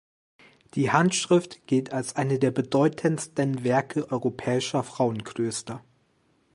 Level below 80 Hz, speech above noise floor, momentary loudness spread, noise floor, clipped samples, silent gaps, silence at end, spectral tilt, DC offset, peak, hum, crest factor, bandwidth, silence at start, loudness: -66 dBFS; 42 dB; 8 LU; -67 dBFS; under 0.1%; none; 0.75 s; -5.5 dB/octave; under 0.1%; -4 dBFS; none; 22 dB; 11.5 kHz; 0.75 s; -26 LUFS